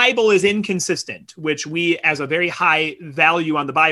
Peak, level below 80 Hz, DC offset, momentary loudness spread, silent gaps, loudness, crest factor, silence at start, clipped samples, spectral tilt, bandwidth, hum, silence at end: -2 dBFS; -62 dBFS; under 0.1%; 9 LU; none; -18 LUFS; 16 dB; 0 s; under 0.1%; -3.5 dB/octave; 12.5 kHz; none; 0 s